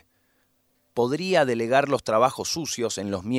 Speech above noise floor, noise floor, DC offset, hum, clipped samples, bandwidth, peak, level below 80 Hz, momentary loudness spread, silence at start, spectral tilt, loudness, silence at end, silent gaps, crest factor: 45 dB; -68 dBFS; under 0.1%; none; under 0.1%; 16 kHz; -4 dBFS; -62 dBFS; 6 LU; 0.95 s; -4 dB/octave; -24 LUFS; 0 s; none; 20 dB